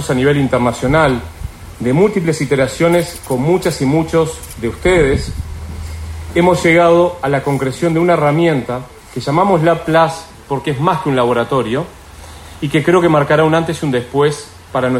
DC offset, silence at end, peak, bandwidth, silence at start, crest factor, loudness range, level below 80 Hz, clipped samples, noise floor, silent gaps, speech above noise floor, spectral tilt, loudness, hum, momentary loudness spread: under 0.1%; 0 s; 0 dBFS; 16 kHz; 0 s; 14 dB; 2 LU; -34 dBFS; under 0.1%; -34 dBFS; none; 21 dB; -6 dB/octave; -14 LUFS; none; 16 LU